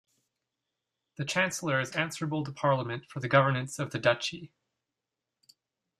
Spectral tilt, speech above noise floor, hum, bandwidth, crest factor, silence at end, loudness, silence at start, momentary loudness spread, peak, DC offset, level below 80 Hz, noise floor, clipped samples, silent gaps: -4.5 dB/octave; 58 dB; none; 14 kHz; 24 dB; 1.55 s; -29 LUFS; 1.2 s; 11 LU; -8 dBFS; under 0.1%; -70 dBFS; -88 dBFS; under 0.1%; none